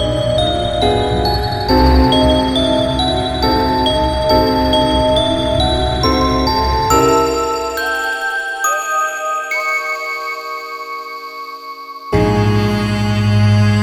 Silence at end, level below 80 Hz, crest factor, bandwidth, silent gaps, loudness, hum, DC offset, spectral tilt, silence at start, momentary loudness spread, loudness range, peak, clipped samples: 0 s; -24 dBFS; 14 dB; 19 kHz; none; -15 LUFS; none; under 0.1%; -5 dB/octave; 0 s; 12 LU; 6 LU; -2 dBFS; under 0.1%